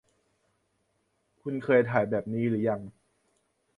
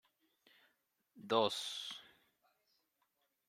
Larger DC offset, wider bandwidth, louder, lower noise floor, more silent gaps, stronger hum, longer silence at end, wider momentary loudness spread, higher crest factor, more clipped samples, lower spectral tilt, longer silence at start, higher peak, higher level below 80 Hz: neither; second, 10 kHz vs 16 kHz; first, -28 LUFS vs -38 LUFS; second, -75 dBFS vs -83 dBFS; neither; neither; second, 0.85 s vs 1.45 s; second, 14 LU vs 18 LU; about the same, 22 dB vs 26 dB; neither; first, -9 dB/octave vs -3 dB/octave; first, 1.45 s vs 1.15 s; first, -8 dBFS vs -18 dBFS; first, -66 dBFS vs under -90 dBFS